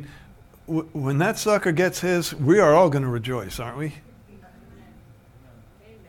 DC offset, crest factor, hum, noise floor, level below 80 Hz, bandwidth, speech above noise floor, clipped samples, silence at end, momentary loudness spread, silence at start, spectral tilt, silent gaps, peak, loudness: under 0.1%; 18 dB; none; -50 dBFS; -52 dBFS; 18.5 kHz; 29 dB; under 0.1%; 1.7 s; 16 LU; 0 s; -6 dB/octave; none; -6 dBFS; -22 LUFS